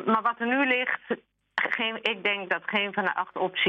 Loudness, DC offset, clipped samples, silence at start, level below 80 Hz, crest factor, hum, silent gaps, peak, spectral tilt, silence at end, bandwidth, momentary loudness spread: -27 LUFS; under 0.1%; under 0.1%; 0 s; -76 dBFS; 20 dB; none; none; -8 dBFS; -5.5 dB/octave; 0 s; 8.2 kHz; 7 LU